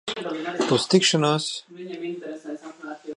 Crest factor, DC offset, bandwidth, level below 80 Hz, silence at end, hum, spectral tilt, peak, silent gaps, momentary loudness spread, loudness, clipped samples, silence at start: 20 dB; under 0.1%; 11 kHz; -70 dBFS; 0 s; none; -4 dB/octave; -4 dBFS; none; 19 LU; -23 LUFS; under 0.1%; 0.05 s